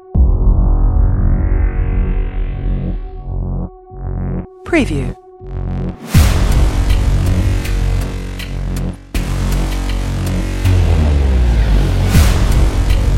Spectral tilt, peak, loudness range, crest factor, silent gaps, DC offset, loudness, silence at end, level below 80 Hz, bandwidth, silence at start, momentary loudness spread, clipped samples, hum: -6.5 dB/octave; 0 dBFS; 6 LU; 14 dB; none; under 0.1%; -17 LUFS; 0 s; -16 dBFS; 16.5 kHz; 0.05 s; 11 LU; under 0.1%; none